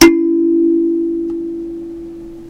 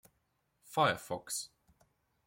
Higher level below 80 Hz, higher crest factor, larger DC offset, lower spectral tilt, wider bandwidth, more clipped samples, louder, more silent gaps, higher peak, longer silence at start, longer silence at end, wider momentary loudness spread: first, -42 dBFS vs -74 dBFS; second, 14 dB vs 24 dB; neither; about the same, -3.5 dB/octave vs -3 dB/octave; about the same, 16 kHz vs 16.5 kHz; first, 0.6% vs under 0.1%; first, -15 LUFS vs -35 LUFS; neither; first, 0 dBFS vs -14 dBFS; second, 0 s vs 0.7 s; second, 0 s vs 0.8 s; first, 16 LU vs 9 LU